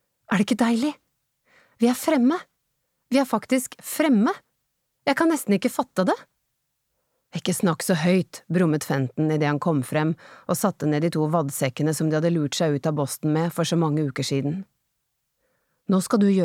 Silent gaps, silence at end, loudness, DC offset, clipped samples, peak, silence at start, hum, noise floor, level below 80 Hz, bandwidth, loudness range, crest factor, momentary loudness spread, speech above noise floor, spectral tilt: none; 0 s; -23 LUFS; under 0.1%; under 0.1%; -8 dBFS; 0.3 s; none; -76 dBFS; -70 dBFS; 16.5 kHz; 2 LU; 16 dB; 7 LU; 54 dB; -6 dB/octave